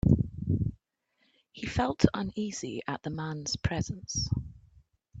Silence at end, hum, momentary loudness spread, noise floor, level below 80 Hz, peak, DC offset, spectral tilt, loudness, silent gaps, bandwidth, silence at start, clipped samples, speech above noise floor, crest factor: 0 s; none; 9 LU; -75 dBFS; -46 dBFS; -4 dBFS; under 0.1%; -5.5 dB/octave; -32 LUFS; none; 8.4 kHz; 0.05 s; under 0.1%; 44 dB; 26 dB